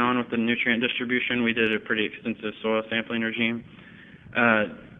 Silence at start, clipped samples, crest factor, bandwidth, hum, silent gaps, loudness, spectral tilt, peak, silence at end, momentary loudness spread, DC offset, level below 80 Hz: 0 s; under 0.1%; 22 dB; 3.9 kHz; none; none; -25 LUFS; -7.5 dB/octave; -4 dBFS; 0 s; 9 LU; under 0.1%; -62 dBFS